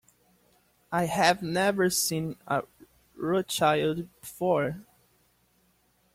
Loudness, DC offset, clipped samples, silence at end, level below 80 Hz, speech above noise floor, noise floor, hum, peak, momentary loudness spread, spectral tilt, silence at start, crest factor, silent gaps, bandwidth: -27 LUFS; under 0.1%; under 0.1%; 1.3 s; -64 dBFS; 41 dB; -68 dBFS; none; -8 dBFS; 12 LU; -4 dB/octave; 0.9 s; 20 dB; none; 16.5 kHz